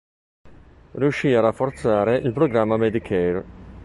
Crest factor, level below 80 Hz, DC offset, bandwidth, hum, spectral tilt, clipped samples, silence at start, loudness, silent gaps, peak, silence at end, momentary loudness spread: 18 dB; -48 dBFS; under 0.1%; 11.5 kHz; none; -7.5 dB/octave; under 0.1%; 0.45 s; -21 LUFS; none; -4 dBFS; 0 s; 7 LU